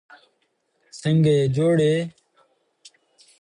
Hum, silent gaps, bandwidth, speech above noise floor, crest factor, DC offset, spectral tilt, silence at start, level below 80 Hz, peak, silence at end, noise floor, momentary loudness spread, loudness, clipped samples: none; none; 10.5 kHz; 51 dB; 14 dB; under 0.1%; -7.5 dB/octave; 0.95 s; -60 dBFS; -10 dBFS; 1.3 s; -70 dBFS; 14 LU; -20 LUFS; under 0.1%